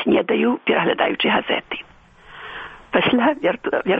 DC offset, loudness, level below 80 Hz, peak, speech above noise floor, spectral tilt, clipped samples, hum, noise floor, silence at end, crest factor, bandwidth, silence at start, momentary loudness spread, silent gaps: under 0.1%; -19 LUFS; -54 dBFS; -2 dBFS; 27 dB; -7.5 dB/octave; under 0.1%; none; -46 dBFS; 0 s; 18 dB; 5 kHz; 0 s; 16 LU; none